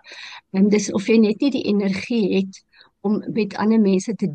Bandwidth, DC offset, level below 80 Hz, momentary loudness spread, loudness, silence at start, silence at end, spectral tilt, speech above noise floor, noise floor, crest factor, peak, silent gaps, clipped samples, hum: 9 kHz; under 0.1%; -66 dBFS; 11 LU; -20 LUFS; 0.05 s; 0 s; -6 dB/octave; 20 dB; -39 dBFS; 14 dB; -6 dBFS; none; under 0.1%; none